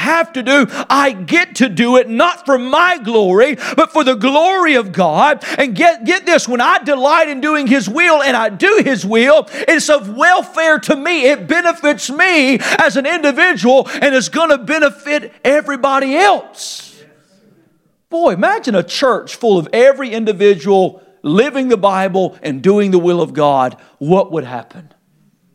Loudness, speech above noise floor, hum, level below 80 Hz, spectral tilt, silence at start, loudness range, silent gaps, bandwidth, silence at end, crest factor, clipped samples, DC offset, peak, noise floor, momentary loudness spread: -12 LUFS; 44 dB; none; -62 dBFS; -4 dB/octave; 0 s; 4 LU; none; 15.5 kHz; 0.75 s; 12 dB; under 0.1%; under 0.1%; 0 dBFS; -56 dBFS; 5 LU